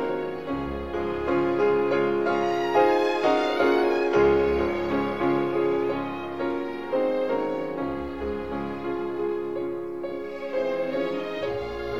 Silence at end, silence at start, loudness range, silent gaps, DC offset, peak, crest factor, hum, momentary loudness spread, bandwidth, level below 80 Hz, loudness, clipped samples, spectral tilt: 0 s; 0 s; 7 LU; none; 0.4%; -8 dBFS; 16 dB; none; 10 LU; 11 kHz; -48 dBFS; -26 LUFS; under 0.1%; -6.5 dB/octave